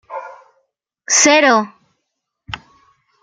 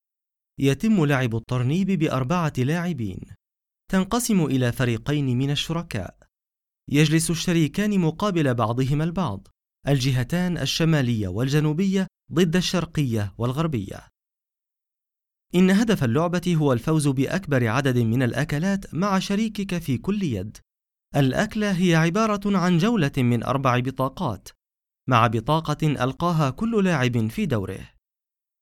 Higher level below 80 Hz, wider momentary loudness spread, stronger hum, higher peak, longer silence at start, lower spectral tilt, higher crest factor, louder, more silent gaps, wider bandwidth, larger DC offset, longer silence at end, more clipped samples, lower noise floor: second, -56 dBFS vs -48 dBFS; first, 22 LU vs 8 LU; neither; first, 0 dBFS vs -4 dBFS; second, 0.1 s vs 0.6 s; second, -1 dB/octave vs -6 dB/octave; about the same, 18 dB vs 18 dB; first, -12 LUFS vs -23 LUFS; neither; second, 10.5 kHz vs 16.5 kHz; neither; about the same, 0.65 s vs 0.75 s; neither; second, -75 dBFS vs under -90 dBFS